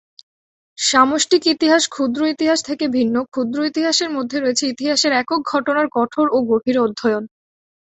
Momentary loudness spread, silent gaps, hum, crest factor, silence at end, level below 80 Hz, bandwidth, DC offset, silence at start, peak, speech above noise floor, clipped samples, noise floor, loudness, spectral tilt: 6 LU; none; none; 18 dB; 0.55 s; -62 dBFS; 8.4 kHz; under 0.1%; 0.8 s; 0 dBFS; over 73 dB; under 0.1%; under -90 dBFS; -17 LUFS; -2.5 dB/octave